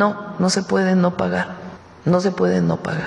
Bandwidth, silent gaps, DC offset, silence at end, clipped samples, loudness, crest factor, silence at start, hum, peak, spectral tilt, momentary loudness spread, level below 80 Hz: 11 kHz; none; under 0.1%; 0 s; under 0.1%; -19 LUFS; 16 dB; 0 s; none; -2 dBFS; -6 dB/octave; 10 LU; -56 dBFS